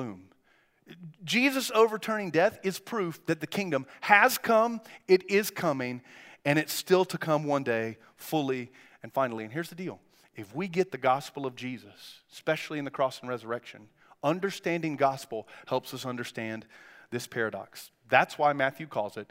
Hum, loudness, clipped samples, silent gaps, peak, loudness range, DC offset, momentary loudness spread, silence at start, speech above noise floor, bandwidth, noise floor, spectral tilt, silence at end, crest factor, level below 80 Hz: none; -29 LUFS; under 0.1%; none; -4 dBFS; 8 LU; under 0.1%; 16 LU; 0 s; 38 dB; 16 kHz; -67 dBFS; -4.5 dB/octave; 0.05 s; 26 dB; -78 dBFS